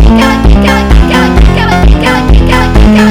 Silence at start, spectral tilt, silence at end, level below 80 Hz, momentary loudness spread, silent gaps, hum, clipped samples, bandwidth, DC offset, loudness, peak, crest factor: 0 s; -6.5 dB/octave; 0 s; -6 dBFS; 2 LU; none; none; 10%; 13.5 kHz; under 0.1%; -6 LUFS; 0 dBFS; 4 dB